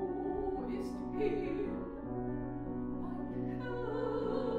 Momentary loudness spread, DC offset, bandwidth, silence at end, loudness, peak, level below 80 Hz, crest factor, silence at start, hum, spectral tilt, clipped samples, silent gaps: 5 LU; under 0.1%; 10 kHz; 0 s; -38 LUFS; -20 dBFS; -52 dBFS; 16 dB; 0 s; none; -8.5 dB/octave; under 0.1%; none